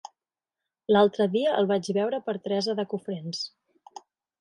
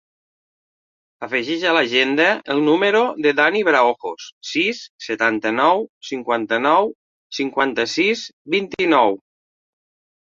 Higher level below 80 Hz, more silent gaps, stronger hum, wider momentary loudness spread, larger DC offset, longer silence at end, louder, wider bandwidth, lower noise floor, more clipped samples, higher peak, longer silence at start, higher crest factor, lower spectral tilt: about the same, -72 dBFS vs -68 dBFS; second, none vs 4.32-4.41 s, 4.89-4.99 s, 5.89-6.01 s, 6.95-7.30 s, 8.33-8.45 s; neither; about the same, 12 LU vs 12 LU; neither; second, 0.95 s vs 1.1 s; second, -26 LUFS vs -18 LUFS; first, 11 kHz vs 7.6 kHz; about the same, under -90 dBFS vs under -90 dBFS; neither; second, -8 dBFS vs -2 dBFS; second, 0.9 s vs 1.2 s; about the same, 20 dB vs 18 dB; first, -5.5 dB/octave vs -4 dB/octave